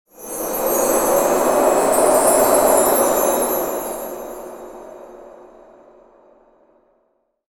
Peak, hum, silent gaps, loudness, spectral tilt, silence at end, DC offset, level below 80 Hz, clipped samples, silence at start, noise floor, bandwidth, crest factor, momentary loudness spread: -2 dBFS; none; none; -16 LUFS; -2.5 dB/octave; 2.2 s; under 0.1%; -48 dBFS; under 0.1%; 0.2 s; -66 dBFS; 19 kHz; 18 dB; 21 LU